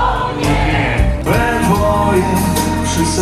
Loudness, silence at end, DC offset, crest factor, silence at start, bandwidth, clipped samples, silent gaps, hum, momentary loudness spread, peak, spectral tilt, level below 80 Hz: -14 LUFS; 0 s; under 0.1%; 12 dB; 0 s; 14.5 kHz; under 0.1%; none; none; 3 LU; -2 dBFS; -5 dB/octave; -22 dBFS